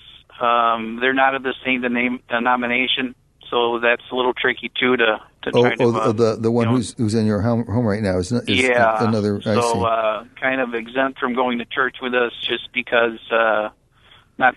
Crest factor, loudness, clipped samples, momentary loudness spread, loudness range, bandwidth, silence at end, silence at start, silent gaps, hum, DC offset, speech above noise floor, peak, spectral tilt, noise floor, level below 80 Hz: 18 dB; -19 LUFS; under 0.1%; 6 LU; 2 LU; 12 kHz; 0 s; 0.05 s; none; none; under 0.1%; 33 dB; -2 dBFS; -5.5 dB/octave; -52 dBFS; -54 dBFS